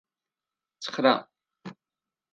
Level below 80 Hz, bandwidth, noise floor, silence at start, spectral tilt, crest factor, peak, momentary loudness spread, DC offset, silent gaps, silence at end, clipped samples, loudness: -82 dBFS; 8.6 kHz; under -90 dBFS; 0.8 s; -4.5 dB/octave; 24 dB; -8 dBFS; 22 LU; under 0.1%; none; 0.6 s; under 0.1%; -25 LUFS